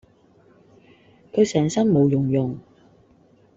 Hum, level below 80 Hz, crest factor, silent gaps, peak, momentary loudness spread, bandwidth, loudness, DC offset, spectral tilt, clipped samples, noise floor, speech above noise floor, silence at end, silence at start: none; -58 dBFS; 18 dB; none; -6 dBFS; 11 LU; 7.8 kHz; -21 LUFS; under 0.1%; -7 dB/octave; under 0.1%; -56 dBFS; 37 dB; 0.95 s; 1.35 s